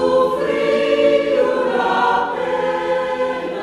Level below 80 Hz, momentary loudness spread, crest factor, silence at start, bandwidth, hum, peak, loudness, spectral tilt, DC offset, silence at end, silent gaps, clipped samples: -52 dBFS; 5 LU; 14 dB; 0 s; 11 kHz; none; -2 dBFS; -17 LUFS; -5 dB/octave; under 0.1%; 0 s; none; under 0.1%